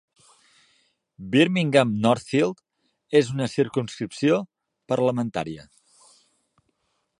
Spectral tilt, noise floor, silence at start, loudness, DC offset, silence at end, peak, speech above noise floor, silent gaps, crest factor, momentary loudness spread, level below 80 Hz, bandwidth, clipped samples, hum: -6 dB/octave; -73 dBFS; 1.2 s; -23 LUFS; under 0.1%; 1.55 s; -2 dBFS; 51 dB; none; 24 dB; 14 LU; -62 dBFS; 11 kHz; under 0.1%; none